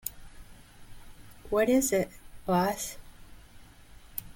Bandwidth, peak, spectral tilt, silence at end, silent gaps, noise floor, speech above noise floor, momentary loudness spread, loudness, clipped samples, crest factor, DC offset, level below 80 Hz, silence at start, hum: 17 kHz; -12 dBFS; -4.5 dB/octave; 0.05 s; none; -51 dBFS; 25 dB; 16 LU; -29 LUFS; under 0.1%; 20 dB; under 0.1%; -52 dBFS; 0.05 s; none